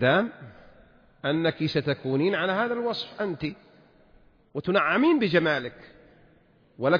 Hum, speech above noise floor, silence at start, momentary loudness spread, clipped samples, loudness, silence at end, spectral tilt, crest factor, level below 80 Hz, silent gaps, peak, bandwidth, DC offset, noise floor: none; 35 dB; 0 s; 13 LU; under 0.1%; -26 LUFS; 0 s; -7.5 dB/octave; 18 dB; -62 dBFS; none; -8 dBFS; 5.2 kHz; under 0.1%; -60 dBFS